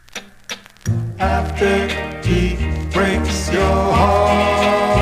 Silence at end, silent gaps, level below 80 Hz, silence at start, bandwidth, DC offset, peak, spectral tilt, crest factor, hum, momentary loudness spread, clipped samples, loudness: 0 s; none; -26 dBFS; 0.15 s; 15.5 kHz; 0.2%; -2 dBFS; -5.5 dB/octave; 16 dB; none; 14 LU; under 0.1%; -17 LUFS